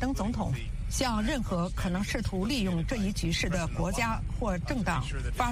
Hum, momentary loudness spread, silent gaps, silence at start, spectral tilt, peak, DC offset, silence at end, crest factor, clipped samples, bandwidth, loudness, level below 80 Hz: none; 4 LU; none; 0 s; -5 dB/octave; -10 dBFS; under 0.1%; 0 s; 18 dB; under 0.1%; 15.5 kHz; -31 LUFS; -36 dBFS